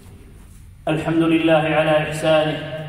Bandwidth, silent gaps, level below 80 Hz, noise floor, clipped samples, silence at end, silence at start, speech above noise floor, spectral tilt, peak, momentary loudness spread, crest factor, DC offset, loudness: 13.5 kHz; none; -46 dBFS; -42 dBFS; under 0.1%; 0 s; 0.05 s; 24 dB; -6 dB/octave; -6 dBFS; 8 LU; 14 dB; under 0.1%; -18 LUFS